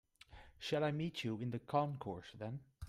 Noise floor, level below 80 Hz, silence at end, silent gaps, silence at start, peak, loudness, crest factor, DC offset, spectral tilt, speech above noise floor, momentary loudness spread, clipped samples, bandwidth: -61 dBFS; -66 dBFS; 0 s; none; 0.3 s; -22 dBFS; -41 LUFS; 20 dB; under 0.1%; -6.5 dB/octave; 20 dB; 18 LU; under 0.1%; 14 kHz